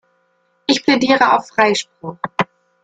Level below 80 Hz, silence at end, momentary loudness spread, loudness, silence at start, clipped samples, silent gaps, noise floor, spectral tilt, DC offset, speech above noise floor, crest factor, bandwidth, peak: -60 dBFS; 0.4 s; 13 LU; -16 LUFS; 0.7 s; under 0.1%; none; -62 dBFS; -3.5 dB/octave; under 0.1%; 47 dB; 18 dB; 9.2 kHz; 0 dBFS